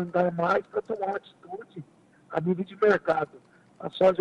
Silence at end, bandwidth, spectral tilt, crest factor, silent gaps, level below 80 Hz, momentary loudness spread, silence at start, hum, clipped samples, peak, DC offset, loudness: 0 s; 8.8 kHz; -7.5 dB/octave; 18 dB; none; -68 dBFS; 18 LU; 0 s; none; under 0.1%; -10 dBFS; under 0.1%; -27 LUFS